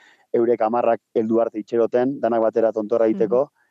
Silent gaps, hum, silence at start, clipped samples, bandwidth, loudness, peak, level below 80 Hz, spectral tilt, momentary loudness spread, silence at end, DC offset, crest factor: none; none; 0.35 s; under 0.1%; 7 kHz; -21 LUFS; -6 dBFS; -84 dBFS; -8.5 dB/octave; 3 LU; 0.25 s; under 0.1%; 14 dB